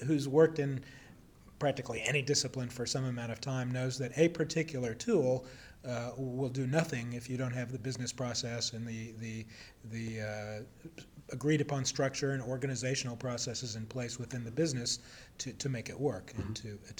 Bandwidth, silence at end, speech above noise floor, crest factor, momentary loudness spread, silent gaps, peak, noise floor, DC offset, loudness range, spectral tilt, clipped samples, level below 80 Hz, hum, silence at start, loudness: 19 kHz; 0.05 s; 22 dB; 20 dB; 13 LU; none; -14 dBFS; -57 dBFS; under 0.1%; 5 LU; -4.5 dB/octave; under 0.1%; -62 dBFS; none; 0 s; -35 LUFS